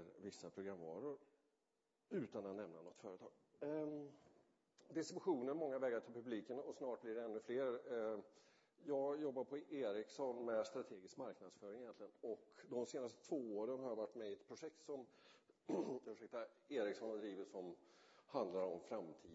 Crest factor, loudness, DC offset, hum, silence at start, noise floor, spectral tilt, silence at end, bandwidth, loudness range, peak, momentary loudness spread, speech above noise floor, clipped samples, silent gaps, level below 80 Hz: 20 dB; -48 LUFS; under 0.1%; none; 0 s; -88 dBFS; -5 dB/octave; 0 s; 7.6 kHz; 5 LU; -30 dBFS; 12 LU; 41 dB; under 0.1%; none; under -90 dBFS